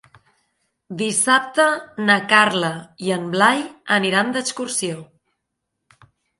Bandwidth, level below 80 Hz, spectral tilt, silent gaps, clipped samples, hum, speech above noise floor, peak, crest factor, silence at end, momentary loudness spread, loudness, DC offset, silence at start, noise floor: 11.5 kHz; -68 dBFS; -3 dB/octave; none; under 0.1%; none; 59 dB; 0 dBFS; 20 dB; 1.35 s; 12 LU; -18 LUFS; under 0.1%; 0.9 s; -78 dBFS